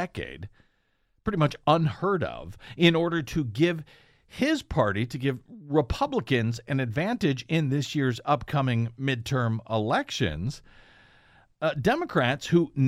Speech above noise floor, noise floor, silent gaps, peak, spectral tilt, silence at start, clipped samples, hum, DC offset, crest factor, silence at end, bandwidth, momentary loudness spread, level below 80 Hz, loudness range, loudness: 44 dB; -70 dBFS; none; -4 dBFS; -6.5 dB/octave; 0 s; under 0.1%; none; under 0.1%; 24 dB; 0 s; 15 kHz; 11 LU; -50 dBFS; 2 LU; -27 LUFS